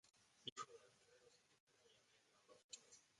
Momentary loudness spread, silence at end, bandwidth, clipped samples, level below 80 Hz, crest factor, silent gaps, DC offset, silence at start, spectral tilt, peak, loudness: 7 LU; 0 s; 11 kHz; under 0.1%; under -90 dBFS; 30 dB; 0.52-0.56 s, 1.60-1.67 s, 2.64-2.69 s; under 0.1%; 0.05 s; -1 dB/octave; -34 dBFS; -57 LUFS